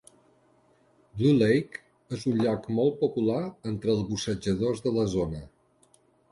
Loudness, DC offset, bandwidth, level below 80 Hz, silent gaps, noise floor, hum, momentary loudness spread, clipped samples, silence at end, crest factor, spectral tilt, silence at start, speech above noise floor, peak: -27 LUFS; under 0.1%; 11.5 kHz; -54 dBFS; none; -64 dBFS; none; 13 LU; under 0.1%; 0.85 s; 16 dB; -6.5 dB/octave; 1.15 s; 37 dB; -12 dBFS